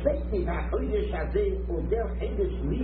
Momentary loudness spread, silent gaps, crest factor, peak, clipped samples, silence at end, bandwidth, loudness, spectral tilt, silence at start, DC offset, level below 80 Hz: 2 LU; none; 16 dB; -10 dBFS; under 0.1%; 0 s; 4.4 kHz; -29 LUFS; -11.5 dB/octave; 0 s; under 0.1%; -32 dBFS